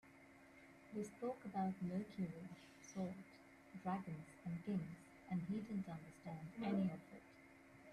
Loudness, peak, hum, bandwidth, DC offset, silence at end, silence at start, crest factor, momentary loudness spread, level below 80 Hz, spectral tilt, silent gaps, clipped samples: -47 LUFS; -30 dBFS; none; 12 kHz; under 0.1%; 0 s; 0.05 s; 18 dB; 20 LU; -78 dBFS; -7.5 dB/octave; none; under 0.1%